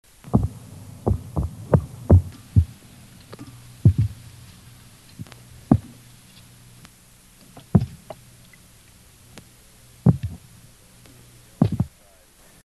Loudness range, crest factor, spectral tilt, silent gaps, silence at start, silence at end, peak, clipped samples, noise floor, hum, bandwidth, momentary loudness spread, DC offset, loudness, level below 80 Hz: 8 LU; 24 dB; -9 dB/octave; none; 0.35 s; 0.75 s; 0 dBFS; under 0.1%; -53 dBFS; none; 12.5 kHz; 25 LU; under 0.1%; -23 LUFS; -36 dBFS